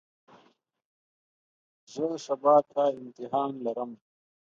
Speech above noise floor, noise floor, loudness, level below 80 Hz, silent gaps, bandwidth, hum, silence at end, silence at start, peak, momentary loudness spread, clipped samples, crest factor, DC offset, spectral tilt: 38 dB; -65 dBFS; -28 LUFS; -84 dBFS; none; 7.6 kHz; none; 0.6 s; 1.9 s; -10 dBFS; 17 LU; under 0.1%; 20 dB; under 0.1%; -6 dB/octave